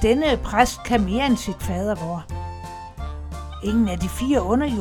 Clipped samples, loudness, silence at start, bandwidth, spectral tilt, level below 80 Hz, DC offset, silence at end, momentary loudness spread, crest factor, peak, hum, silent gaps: under 0.1%; -22 LUFS; 0 s; 18 kHz; -5.5 dB/octave; -32 dBFS; under 0.1%; 0 s; 14 LU; 22 dB; 0 dBFS; none; none